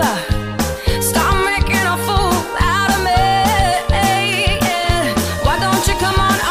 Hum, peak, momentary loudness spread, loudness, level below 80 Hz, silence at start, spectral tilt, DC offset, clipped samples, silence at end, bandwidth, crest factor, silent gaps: none; -4 dBFS; 4 LU; -15 LUFS; -24 dBFS; 0 s; -4 dB/octave; under 0.1%; under 0.1%; 0 s; 15.5 kHz; 12 dB; none